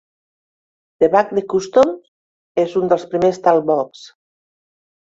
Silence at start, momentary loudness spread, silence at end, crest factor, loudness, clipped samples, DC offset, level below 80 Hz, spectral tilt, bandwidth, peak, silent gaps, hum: 1 s; 7 LU; 0.95 s; 18 dB; -17 LUFS; under 0.1%; under 0.1%; -60 dBFS; -6 dB/octave; 7.8 kHz; -2 dBFS; 2.08-2.55 s; none